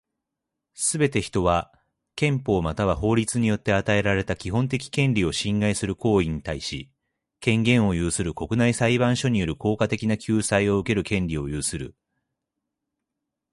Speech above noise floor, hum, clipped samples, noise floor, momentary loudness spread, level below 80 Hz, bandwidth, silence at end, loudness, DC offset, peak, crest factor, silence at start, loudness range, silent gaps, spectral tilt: 61 dB; none; under 0.1%; -84 dBFS; 7 LU; -42 dBFS; 11.5 kHz; 1.65 s; -23 LUFS; under 0.1%; -6 dBFS; 18 dB; 0.8 s; 3 LU; none; -5 dB/octave